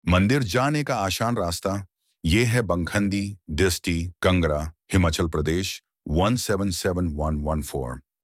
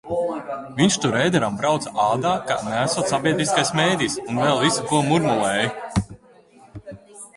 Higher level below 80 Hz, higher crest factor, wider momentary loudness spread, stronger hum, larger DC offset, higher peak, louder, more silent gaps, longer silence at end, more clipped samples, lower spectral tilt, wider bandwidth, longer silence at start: first, -36 dBFS vs -50 dBFS; about the same, 18 dB vs 18 dB; about the same, 9 LU vs 11 LU; neither; neither; about the same, -6 dBFS vs -4 dBFS; second, -24 LUFS vs -21 LUFS; neither; first, 0.25 s vs 0.1 s; neither; first, -5.5 dB/octave vs -4 dB/octave; first, 16 kHz vs 11.5 kHz; about the same, 0.05 s vs 0.05 s